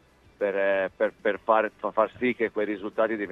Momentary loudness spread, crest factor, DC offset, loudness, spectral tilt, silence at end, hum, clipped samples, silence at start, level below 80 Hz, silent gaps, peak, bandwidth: 5 LU; 20 dB; under 0.1%; -26 LUFS; -7 dB/octave; 0 s; none; under 0.1%; 0.4 s; -66 dBFS; none; -8 dBFS; 5.8 kHz